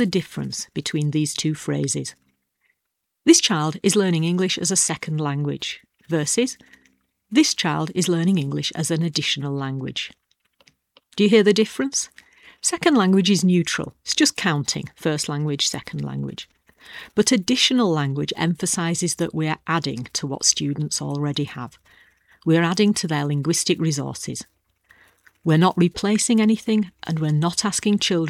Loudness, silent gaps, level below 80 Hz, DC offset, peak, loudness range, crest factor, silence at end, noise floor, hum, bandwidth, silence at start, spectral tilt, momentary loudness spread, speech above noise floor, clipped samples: -21 LUFS; none; -60 dBFS; under 0.1%; -2 dBFS; 3 LU; 20 dB; 0 s; -79 dBFS; none; 14.5 kHz; 0 s; -4 dB/octave; 12 LU; 58 dB; under 0.1%